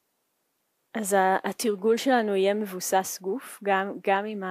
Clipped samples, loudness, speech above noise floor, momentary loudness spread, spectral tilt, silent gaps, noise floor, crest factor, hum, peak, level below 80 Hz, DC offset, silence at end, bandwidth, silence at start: under 0.1%; -26 LUFS; 50 dB; 9 LU; -3.5 dB/octave; none; -75 dBFS; 16 dB; none; -10 dBFS; -82 dBFS; under 0.1%; 0 s; 15.5 kHz; 0.95 s